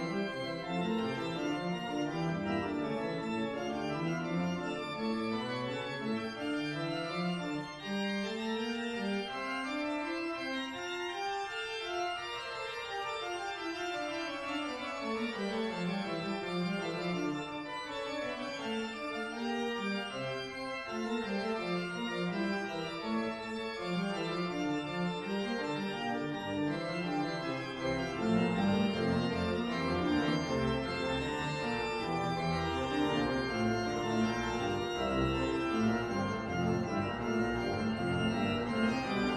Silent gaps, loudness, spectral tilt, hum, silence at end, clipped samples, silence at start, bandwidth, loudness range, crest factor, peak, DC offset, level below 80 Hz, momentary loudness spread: none; -35 LUFS; -5.5 dB/octave; none; 0 s; under 0.1%; 0 s; 12.5 kHz; 4 LU; 18 dB; -16 dBFS; under 0.1%; -56 dBFS; 6 LU